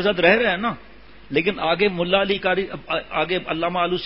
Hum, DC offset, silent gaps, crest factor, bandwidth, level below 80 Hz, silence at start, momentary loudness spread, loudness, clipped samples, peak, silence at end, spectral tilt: none; 0.5%; none; 20 dB; 5.8 kHz; -50 dBFS; 0 s; 9 LU; -21 LUFS; under 0.1%; -2 dBFS; 0 s; -9.5 dB/octave